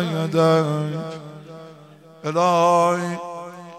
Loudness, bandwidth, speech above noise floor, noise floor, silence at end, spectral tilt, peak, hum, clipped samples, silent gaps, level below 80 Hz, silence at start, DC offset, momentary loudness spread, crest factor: -20 LUFS; 14 kHz; 26 dB; -46 dBFS; 0 s; -6 dB/octave; -6 dBFS; none; under 0.1%; none; -72 dBFS; 0 s; under 0.1%; 22 LU; 16 dB